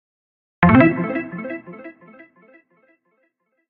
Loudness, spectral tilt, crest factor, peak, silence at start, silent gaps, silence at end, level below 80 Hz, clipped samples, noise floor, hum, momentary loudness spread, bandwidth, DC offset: -17 LUFS; -11 dB/octave; 20 dB; 0 dBFS; 0.6 s; none; 1.8 s; -44 dBFS; under 0.1%; -69 dBFS; none; 26 LU; 4.4 kHz; under 0.1%